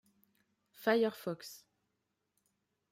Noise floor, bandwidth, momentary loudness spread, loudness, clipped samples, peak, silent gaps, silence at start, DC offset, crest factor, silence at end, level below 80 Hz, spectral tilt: -84 dBFS; 16 kHz; 15 LU; -34 LUFS; under 0.1%; -18 dBFS; none; 0.8 s; under 0.1%; 22 dB; 1.35 s; -86 dBFS; -5 dB/octave